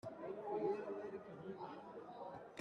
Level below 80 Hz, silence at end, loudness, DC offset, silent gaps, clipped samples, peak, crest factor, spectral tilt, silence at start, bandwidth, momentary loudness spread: -84 dBFS; 0 s; -47 LUFS; under 0.1%; none; under 0.1%; -30 dBFS; 18 dB; -7.5 dB/octave; 0.05 s; 8.8 kHz; 11 LU